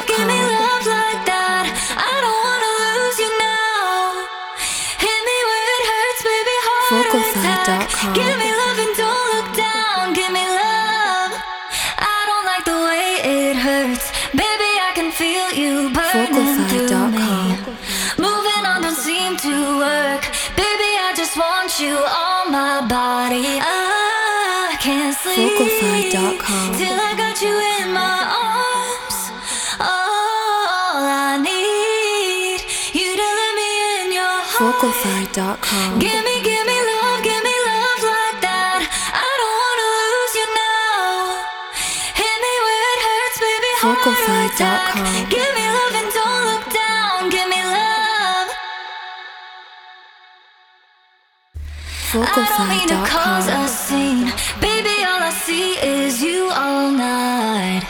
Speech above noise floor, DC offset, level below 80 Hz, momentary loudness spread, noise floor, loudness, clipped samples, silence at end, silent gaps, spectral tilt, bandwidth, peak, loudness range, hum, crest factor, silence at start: 40 dB; under 0.1%; -44 dBFS; 4 LU; -58 dBFS; -17 LUFS; under 0.1%; 0 s; none; -2.5 dB/octave; over 20 kHz; 0 dBFS; 2 LU; none; 18 dB; 0 s